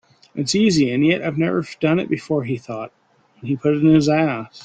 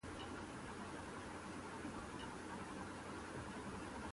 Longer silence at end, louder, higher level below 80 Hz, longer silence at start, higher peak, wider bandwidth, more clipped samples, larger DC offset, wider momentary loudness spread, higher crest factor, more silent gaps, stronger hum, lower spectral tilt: about the same, 0 s vs 0 s; first, -19 LUFS vs -50 LUFS; first, -54 dBFS vs -62 dBFS; first, 0.35 s vs 0.05 s; first, -4 dBFS vs -36 dBFS; second, 9.2 kHz vs 11.5 kHz; neither; neither; first, 16 LU vs 1 LU; about the same, 16 dB vs 12 dB; neither; neither; first, -6 dB/octave vs -4.5 dB/octave